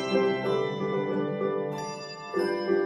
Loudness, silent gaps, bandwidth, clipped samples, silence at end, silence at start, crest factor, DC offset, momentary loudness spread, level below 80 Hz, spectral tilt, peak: -29 LUFS; none; 11 kHz; under 0.1%; 0 s; 0 s; 16 dB; under 0.1%; 8 LU; -68 dBFS; -6 dB/octave; -12 dBFS